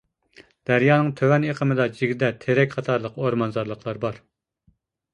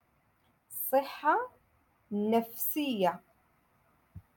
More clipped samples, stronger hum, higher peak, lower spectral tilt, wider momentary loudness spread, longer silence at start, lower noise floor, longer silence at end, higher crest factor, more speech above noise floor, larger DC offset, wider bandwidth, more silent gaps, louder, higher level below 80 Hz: neither; neither; first, -4 dBFS vs -14 dBFS; first, -8 dB/octave vs -4.5 dB/octave; about the same, 11 LU vs 12 LU; about the same, 0.7 s vs 0.7 s; second, -65 dBFS vs -71 dBFS; first, 0.95 s vs 0.15 s; about the same, 20 dB vs 20 dB; about the same, 43 dB vs 41 dB; neither; second, 9.4 kHz vs 17.5 kHz; neither; first, -22 LUFS vs -31 LUFS; first, -60 dBFS vs -72 dBFS